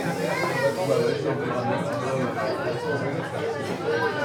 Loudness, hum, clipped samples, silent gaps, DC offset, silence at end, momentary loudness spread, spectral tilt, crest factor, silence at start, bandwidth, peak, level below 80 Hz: -26 LUFS; none; under 0.1%; none; under 0.1%; 0 s; 5 LU; -5.5 dB/octave; 14 dB; 0 s; 19.5 kHz; -10 dBFS; -68 dBFS